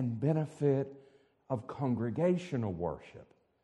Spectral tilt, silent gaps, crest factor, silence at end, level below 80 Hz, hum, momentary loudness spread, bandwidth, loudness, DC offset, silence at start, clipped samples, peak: -9 dB/octave; none; 18 dB; 0.4 s; -64 dBFS; none; 10 LU; 10 kHz; -34 LUFS; under 0.1%; 0 s; under 0.1%; -16 dBFS